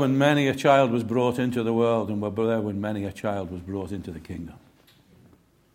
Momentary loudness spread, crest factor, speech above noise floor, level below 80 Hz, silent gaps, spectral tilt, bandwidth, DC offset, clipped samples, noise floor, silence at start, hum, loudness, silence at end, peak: 17 LU; 22 dB; 34 dB; -56 dBFS; none; -6.5 dB/octave; 16.5 kHz; under 0.1%; under 0.1%; -58 dBFS; 0 s; none; -24 LUFS; 1.2 s; -4 dBFS